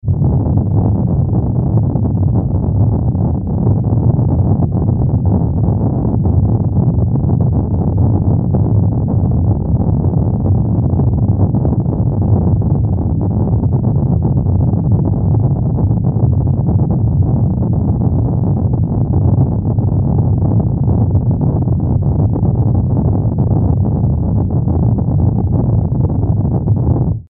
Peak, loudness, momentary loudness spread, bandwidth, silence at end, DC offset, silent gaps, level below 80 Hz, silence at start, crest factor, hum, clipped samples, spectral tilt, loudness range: 0 dBFS; -14 LUFS; 2 LU; 1.6 kHz; 0.1 s; under 0.1%; none; -24 dBFS; 0.05 s; 12 dB; none; under 0.1%; -16.5 dB/octave; 0 LU